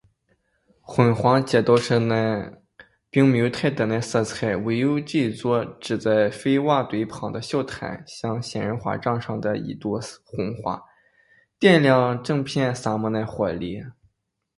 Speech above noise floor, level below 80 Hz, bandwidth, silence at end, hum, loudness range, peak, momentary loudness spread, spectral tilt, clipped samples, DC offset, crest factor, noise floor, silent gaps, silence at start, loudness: 49 dB; -56 dBFS; 11.5 kHz; 0.65 s; none; 7 LU; -2 dBFS; 12 LU; -6.5 dB/octave; under 0.1%; under 0.1%; 20 dB; -71 dBFS; none; 0.9 s; -23 LUFS